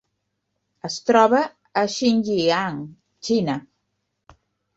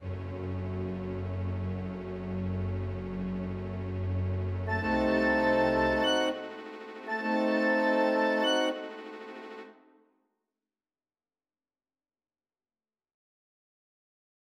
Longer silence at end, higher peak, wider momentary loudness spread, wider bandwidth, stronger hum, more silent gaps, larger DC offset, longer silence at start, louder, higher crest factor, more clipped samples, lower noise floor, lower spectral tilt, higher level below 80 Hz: second, 1.15 s vs 4.85 s; first, -2 dBFS vs -14 dBFS; about the same, 18 LU vs 16 LU; second, 8 kHz vs 9.4 kHz; first, 50 Hz at -55 dBFS vs none; neither; neither; first, 0.85 s vs 0 s; first, -21 LUFS vs -30 LUFS; about the same, 20 dB vs 18 dB; neither; second, -76 dBFS vs under -90 dBFS; second, -4.5 dB/octave vs -6 dB/octave; second, -64 dBFS vs -52 dBFS